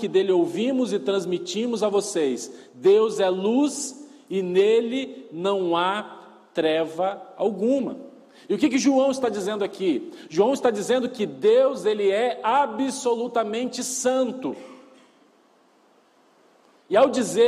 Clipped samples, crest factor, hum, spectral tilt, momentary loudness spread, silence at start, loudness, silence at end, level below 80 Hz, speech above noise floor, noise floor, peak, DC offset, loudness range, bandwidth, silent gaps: under 0.1%; 16 dB; none; -4 dB/octave; 11 LU; 0 s; -23 LUFS; 0 s; -74 dBFS; 37 dB; -59 dBFS; -6 dBFS; under 0.1%; 5 LU; 14 kHz; none